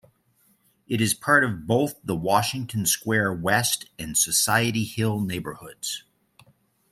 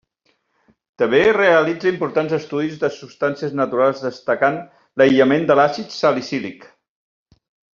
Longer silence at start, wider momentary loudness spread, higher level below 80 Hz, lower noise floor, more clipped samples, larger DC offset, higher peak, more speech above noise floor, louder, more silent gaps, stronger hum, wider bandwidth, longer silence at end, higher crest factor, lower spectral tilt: about the same, 0.9 s vs 1 s; about the same, 12 LU vs 11 LU; about the same, -58 dBFS vs -60 dBFS; about the same, -65 dBFS vs -66 dBFS; neither; neither; about the same, -4 dBFS vs -2 dBFS; second, 41 dB vs 49 dB; second, -23 LUFS vs -18 LUFS; neither; neither; first, 16 kHz vs 7.4 kHz; second, 0.95 s vs 1.1 s; about the same, 20 dB vs 18 dB; about the same, -3.5 dB/octave vs -4 dB/octave